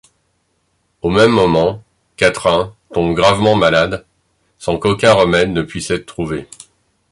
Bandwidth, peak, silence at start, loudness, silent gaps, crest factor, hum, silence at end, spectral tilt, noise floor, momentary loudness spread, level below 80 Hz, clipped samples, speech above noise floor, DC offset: 11.5 kHz; 0 dBFS; 1.05 s; -14 LUFS; none; 16 dB; none; 0.7 s; -5 dB/octave; -64 dBFS; 12 LU; -40 dBFS; under 0.1%; 50 dB; under 0.1%